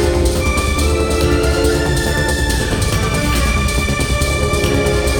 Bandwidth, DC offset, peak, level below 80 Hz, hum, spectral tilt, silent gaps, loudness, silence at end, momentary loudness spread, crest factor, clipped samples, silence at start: over 20 kHz; under 0.1%; -2 dBFS; -20 dBFS; none; -4.5 dB/octave; none; -16 LUFS; 0 s; 2 LU; 14 dB; under 0.1%; 0 s